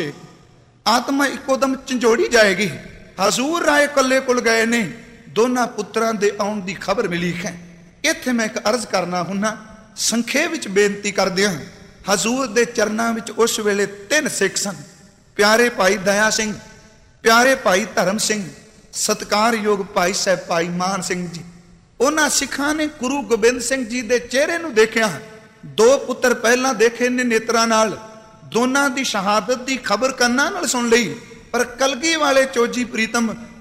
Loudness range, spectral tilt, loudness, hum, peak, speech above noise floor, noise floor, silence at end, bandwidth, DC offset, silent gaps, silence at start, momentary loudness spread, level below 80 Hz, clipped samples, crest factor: 4 LU; -3 dB/octave; -18 LUFS; none; -2 dBFS; 31 dB; -49 dBFS; 0 s; 16 kHz; under 0.1%; none; 0 s; 10 LU; -52 dBFS; under 0.1%; 18 dB